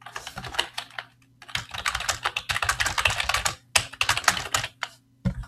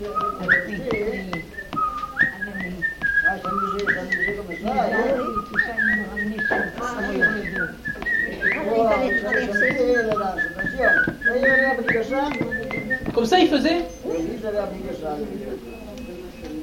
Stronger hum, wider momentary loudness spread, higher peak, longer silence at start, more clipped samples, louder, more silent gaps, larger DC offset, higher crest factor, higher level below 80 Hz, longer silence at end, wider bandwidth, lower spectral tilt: neither; about the same, 14 LU vs 12 LU; first, 0 dBFS vs -4 dBFS; about the same, 0.05 s vs 0 s; neither; second, -25 LUFS vs -22 LUFS; neither; neither; first, 28 dB vs 18 dB; about the same, -44 dBFS vs -44 dBFS; about the same, 0 s vs 0 s; about the same, 15.5 kHz vs 17 kHz; second, -1.5 dB/octave vs -5 dB/octave